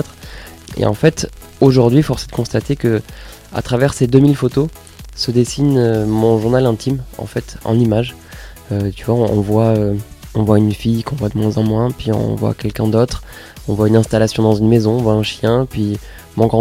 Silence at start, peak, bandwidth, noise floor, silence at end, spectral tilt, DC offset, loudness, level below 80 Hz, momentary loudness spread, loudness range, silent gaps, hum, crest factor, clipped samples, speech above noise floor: 0 s; 0 dBFS; 16 kHz; -34 dBFS; 0 s; -7 dB/octave; under 0.1%; -15 LUFS; -36 dBFS; 14 LU; 3 LU; none; none; 16 dB; under 0.1%; 19 dB